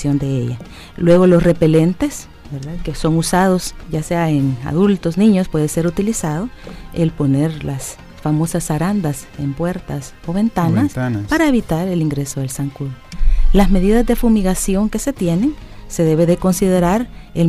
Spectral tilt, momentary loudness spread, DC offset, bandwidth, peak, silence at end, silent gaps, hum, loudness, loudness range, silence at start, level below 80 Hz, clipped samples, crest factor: -6.5 dB/octave; 13 LU; under 0.1%; 15.5 kHz; -2 dBFS; 0 s; none; none; -17 LUFS; 4 LU; 0 s; -24 dBFS; under 0.1%; 14 dB